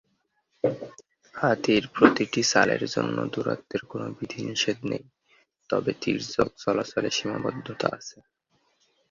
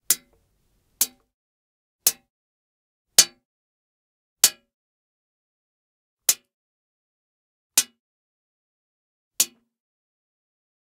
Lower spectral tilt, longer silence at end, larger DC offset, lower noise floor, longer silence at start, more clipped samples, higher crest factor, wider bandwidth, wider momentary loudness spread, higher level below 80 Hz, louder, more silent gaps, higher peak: first, -4 dB/octave vs 2.5 dB/octave; second, 1 s vs 1.4 s; neither; first, -73 dBFS vs -68 dBFS; first, 0.65 s vs 0.1 s; neither; about the same, 26 dB vs 30 dB; second, 7.6 kHz vs 16 kHz; first, 14 LU vs 8 LU; first, -62 dBFS vs -74 dBFS; second, -26 LUFS vs -21 LUFS; second, none vs 1.34-1.99 s, 2.30-3.05 s, 3.45-4.36 s, 4.74-6.17 s, 6.54-7.70 s, 8.00-9.31 s; about the same, -2 dBFS vs 0 dBFS